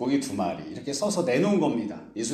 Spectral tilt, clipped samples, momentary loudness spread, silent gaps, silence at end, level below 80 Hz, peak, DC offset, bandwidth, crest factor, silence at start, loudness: -5 dB/octave; under 0.1%; 10 LU; none; 0 s; -64 dBFS; -12 dBFS; under 0.1%; 14 kHz; 14 dB; 0 s; -27 LUFS